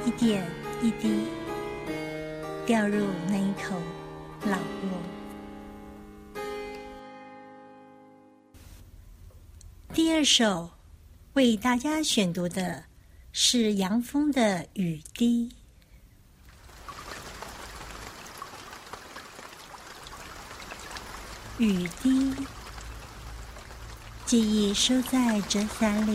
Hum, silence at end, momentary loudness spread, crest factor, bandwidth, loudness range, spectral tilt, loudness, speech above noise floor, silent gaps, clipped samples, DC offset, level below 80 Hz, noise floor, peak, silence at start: none; 0 s; 21 LU; 20 dB; 16 kHz; 16 LU; -4 dB/octave; -27 LUFS; 29 dB; none; under 0.1%; under 0.1%; -50 dBFS; -55 dBFS; -8 dBFS; 0 s